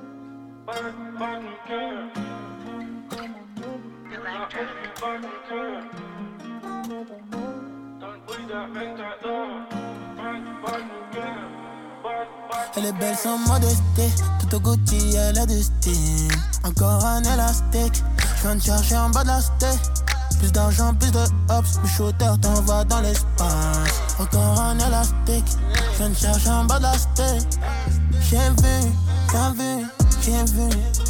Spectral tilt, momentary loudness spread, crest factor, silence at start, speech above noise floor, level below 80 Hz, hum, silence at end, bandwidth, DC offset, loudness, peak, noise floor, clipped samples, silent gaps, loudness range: -4.5 dB/octave; 17 LU; 16 dB; 0 s; 21 dB; -24 dBFS; none; 0 s; 18 kHz; under 0.1%; -21 LUFS; -6 dBFS; -41 dBFS; under 0.1%; none; 14 LU